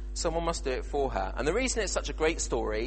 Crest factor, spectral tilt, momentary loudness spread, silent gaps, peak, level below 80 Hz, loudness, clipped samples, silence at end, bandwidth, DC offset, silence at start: 16 dB; -3.5 dB/octave; 3 LU; none; -14 dBFS; -36 dBFS; -30 LUFS; under 0.1%; 0 s; 8.8 kHz; under 0.1%; 0 s